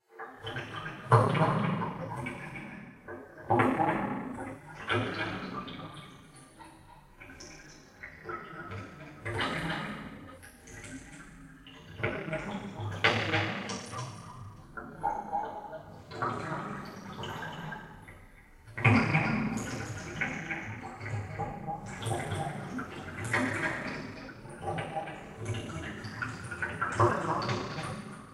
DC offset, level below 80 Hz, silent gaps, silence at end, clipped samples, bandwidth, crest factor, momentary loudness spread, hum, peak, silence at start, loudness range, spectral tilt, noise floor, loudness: under 0.1%; -58 dBFS; none; 0 s; under 0.1%; 13 kHz; 28 dB; 21 LU; none; -6 dBFS; 0.1 s; 8 LU; -5.5 dB/octave; -54 dBFS; -33 LUFS